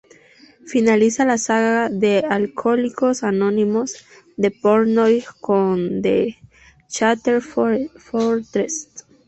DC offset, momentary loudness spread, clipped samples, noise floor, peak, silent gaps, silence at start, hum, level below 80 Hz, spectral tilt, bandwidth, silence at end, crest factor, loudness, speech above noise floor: under 0.1%; 9 LU; under 0.1%; -49 dBFS; -2 dBFS; none; 0.65 s; none; -58 dBFS; -5 dB/octave; 8.2 kHz; 0.25 s; 16 dB; -19 LUFS; 31 dB